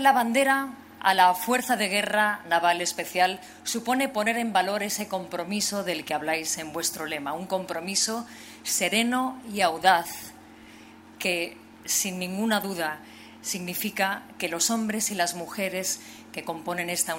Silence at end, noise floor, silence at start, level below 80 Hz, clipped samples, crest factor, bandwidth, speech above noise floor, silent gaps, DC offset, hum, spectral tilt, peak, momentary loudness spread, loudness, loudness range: 0 s; -49 dBFS; 0 s; -70 dBFS; under 0.1%; 22 dB; 16 kHz; 22 dB; none; under 0.1%; none; -2 dB/octave; -4 dBFS; 12 LU; -26 LUFS; 5 LU